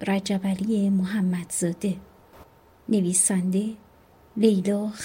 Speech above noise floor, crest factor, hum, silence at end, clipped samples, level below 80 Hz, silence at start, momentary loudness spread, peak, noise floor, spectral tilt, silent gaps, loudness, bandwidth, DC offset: 31 dB; 18 dB; none; 0 s; under 0.1%; -60 dBFS; 0 s; 13 LU; -8 dBFS; -55 dBFS; -5 dB/octave; none; -24 LUFS; 16.5 kHz; under 0.1%